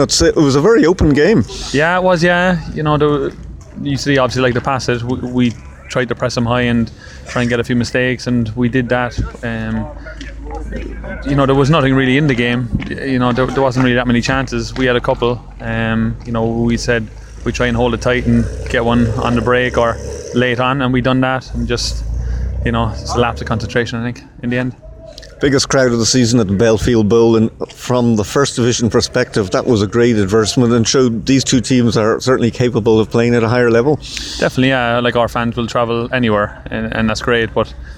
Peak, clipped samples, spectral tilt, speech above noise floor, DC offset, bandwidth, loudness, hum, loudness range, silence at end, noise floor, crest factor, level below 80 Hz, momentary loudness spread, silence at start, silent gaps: -2 dBFS; under 0.1%; -5.5 dB/octave; 20 dB; under 0.1%; 13.5 kHz; -15 LUFS; none; 4 LU; 0 s; -34 dBFS; 12 dB; -30 dBFS; 11 LU; 0 s; none